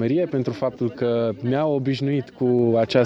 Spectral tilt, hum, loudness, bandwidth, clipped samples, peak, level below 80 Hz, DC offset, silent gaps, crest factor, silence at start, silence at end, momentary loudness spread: -8 dB/octave; none; -22 LUFS; 7.8 kHz; under 0.1%; -6 dBFS; -60 dBFS; under 0.1%; none; 16 dB; 0 s; 0 s; 6 LU